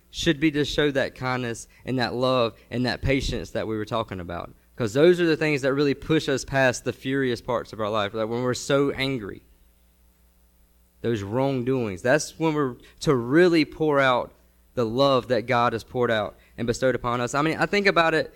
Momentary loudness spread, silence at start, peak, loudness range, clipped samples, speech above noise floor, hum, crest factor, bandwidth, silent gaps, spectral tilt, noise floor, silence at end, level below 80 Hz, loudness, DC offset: 10 LU; 0.15 s; -6 dBFS; 6 LU; under 0.1%; 36 dB; none; 18 dB; 17 kHz; none; -5.5 dB/octave; -59 dBFS; 0.05 s; -46 dBFS; -24 LUFS; under 0.1%